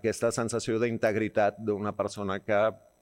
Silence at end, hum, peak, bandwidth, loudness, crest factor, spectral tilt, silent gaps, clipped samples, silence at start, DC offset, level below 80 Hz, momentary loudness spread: 0.25 s; none; -12 dBFS; 16.5 kHz; -29 LUFS; 16 dB; -5 dB/octave; none; under 0.1%; 0.05 s; under 0.1%; -64 dBFS; 5 LU